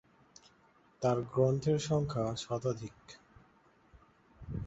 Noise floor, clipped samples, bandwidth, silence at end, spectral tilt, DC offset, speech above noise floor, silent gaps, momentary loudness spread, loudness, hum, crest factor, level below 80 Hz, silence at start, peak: -66 dBFS; under 0.1%; 8 kHz; 0 s; -6.5 dB/octave; under 0.1%; 34 dB; none; 25 LU; -33 LUFS; none; 20 dB; -58 dBFS; 1 s; -16 dBFS